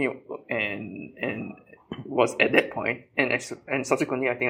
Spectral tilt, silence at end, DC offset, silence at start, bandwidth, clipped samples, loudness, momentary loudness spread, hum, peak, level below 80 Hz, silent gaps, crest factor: -4.5 dB/octave; 0 s; under 0.1%; 0 s; 16 kHz; under 0.1%; -26 LUFS; 17 LU; none; -2 dBFS; -66 dBFS; none; 24 dB